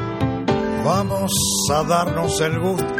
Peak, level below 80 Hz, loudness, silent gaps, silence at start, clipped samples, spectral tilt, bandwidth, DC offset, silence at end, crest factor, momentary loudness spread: -4 dBFS; -42 dBFS; -20 LUFS; none; 0 s; under 0.1%; -4 dB/octave; 17 kHz; under 0.1%; 0 s; 16 dB; 4 LU